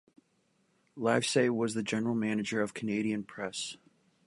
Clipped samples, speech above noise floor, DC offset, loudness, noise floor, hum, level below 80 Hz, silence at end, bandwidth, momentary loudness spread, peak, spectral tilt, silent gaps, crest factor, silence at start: under 0.1%; 42 dB; under 0.1%; -32 LUFS; -73 dBFS; none; -74 dBFS; 0.5 s; 11.5 kHz; 11 LU; -12 dBFS; -4.5 dB/octave; none; 22 dB; 0.95 s